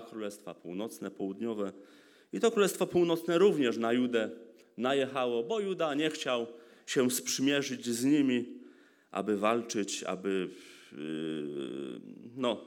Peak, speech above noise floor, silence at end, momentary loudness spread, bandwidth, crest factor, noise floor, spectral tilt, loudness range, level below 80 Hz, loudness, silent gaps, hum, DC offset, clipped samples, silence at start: -12 dBFS; 26 dB; 0 s; 16 LU; 19 kHz; 20 dB; -58 dBFS; -4 dB/octave; 5 LU; -82 dBFS; -32 LUFS; none; none; under 0.1%; under 0.1%; 0 s